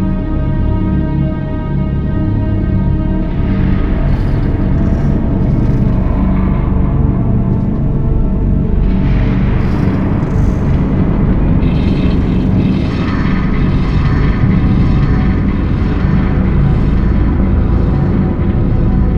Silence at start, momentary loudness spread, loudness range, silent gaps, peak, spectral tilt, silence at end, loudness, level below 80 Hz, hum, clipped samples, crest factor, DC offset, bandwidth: 0 s; 3 LU; 2 LU; none; 0 dBFS; -10 dB/octave; 0 s; -14 LUFS; -16 dBFS; none; under 0.1%; 10 dB; 0.9%; 5.8 kHz